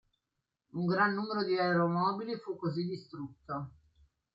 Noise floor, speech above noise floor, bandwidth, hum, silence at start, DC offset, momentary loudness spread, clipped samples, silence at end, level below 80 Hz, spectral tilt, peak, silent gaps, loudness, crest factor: -87 dBFS; 54 dB; 7 kHz; none; 0.75 s; under 0.1%; 15 LU; under 0.1%; 0.65 s; -72 dBFS; -8.5 dB/octave; -14 dBFS; none; -33 LUFS; 20 dB